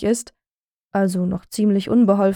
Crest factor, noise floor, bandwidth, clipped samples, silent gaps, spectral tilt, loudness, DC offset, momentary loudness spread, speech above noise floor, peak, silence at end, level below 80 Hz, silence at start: 16 dB; under -90 dBFS; 17 kHz; under 0.1%; 0.51-0.85 s; -6.5 dB/octave; -20 LUFS; under 0.1%; 9 LU; over 72 dB; -4 dBFS; 0 s; -52 dBFS; 0 s